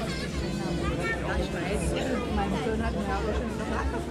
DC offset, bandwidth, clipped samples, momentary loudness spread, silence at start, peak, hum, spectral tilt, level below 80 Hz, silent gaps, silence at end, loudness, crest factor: under 0.1%; 14 kHz; under 0.1%; 2 LU; 0 s; -16 dBFS; none; -5.5 dB/octave; -36 dBFS; none; 0 s; -30 LUFS; 14 dB